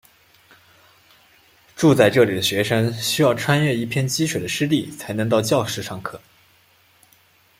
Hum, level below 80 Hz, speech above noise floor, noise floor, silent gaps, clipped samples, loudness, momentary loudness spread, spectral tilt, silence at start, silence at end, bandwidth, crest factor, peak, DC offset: none; -58 dBFS; 37 dB; -57 dBFS; none; under 0.1%; -19 LUFS; 12 LU; -5 dB/octave; 1.75 s; 1.4 s; 16.5 kHz; 20 dB; -2 dBFS; under 0.1%